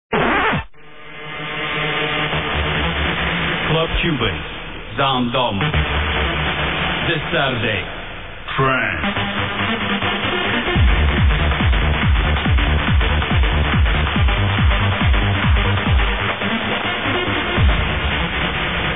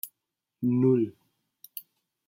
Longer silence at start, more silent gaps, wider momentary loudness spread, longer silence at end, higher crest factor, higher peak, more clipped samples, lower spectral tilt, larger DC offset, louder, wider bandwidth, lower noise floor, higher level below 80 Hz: about the same, 0.1 s vs 0.05 s; neither; second, 5 LU vs 19 LU; second, 0 s vs 0.5 s; about the same, 14 dB vs 18 dB; first, -4 dBFS vs -12 dBFS; neither; about the same, -9 dB/octave vs -9 dB/octave; first, 1% vs under 0.1%; first, -18 LUFS vs -26 LUFS; second, 4 kHz vs 16.5 kHz; second, -40 dBFS vs -85 dBFS; first, -22 dBFS vs -76 dBFS